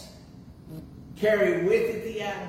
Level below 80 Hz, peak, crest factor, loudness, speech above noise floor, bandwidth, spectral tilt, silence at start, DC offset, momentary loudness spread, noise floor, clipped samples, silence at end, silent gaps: -54 dBFS; -10 dBFS; 16 dB; -25 LUFS; 22 dB; 16 kHz; -6 dB/octave; 0 s; under 0.1%; 22 LU; -47 dBFS; under 0.1%; 0 s; none